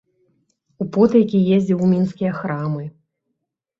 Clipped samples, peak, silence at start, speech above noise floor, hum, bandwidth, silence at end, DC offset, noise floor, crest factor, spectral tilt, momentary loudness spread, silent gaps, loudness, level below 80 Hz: under 0.1%; -2 dBFS; 0.8 s; 60 dB; none; 7.4 kHz; 0.9 s; under 0.1%; -77 dBFS; 18 dB; -9.5 dB/octave; 13 LU; none; -18 LUFS; -60 dBFS